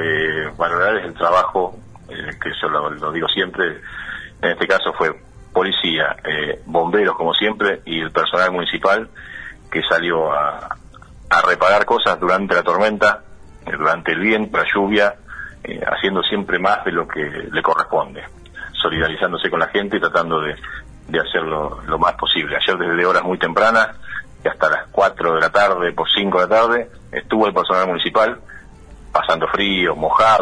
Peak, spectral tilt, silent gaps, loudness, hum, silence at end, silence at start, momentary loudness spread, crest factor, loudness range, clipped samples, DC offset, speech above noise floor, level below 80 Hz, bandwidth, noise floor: 0 dBFS; -4.5 dB/octave; none; -17 LUFS; none; 0 s; 0 s; 14 LU; 18 dB; 4 LU; under 0.1%; under 0.1%; 22 dB; -44 dBFS; 10.5 kHz; -40 dBFS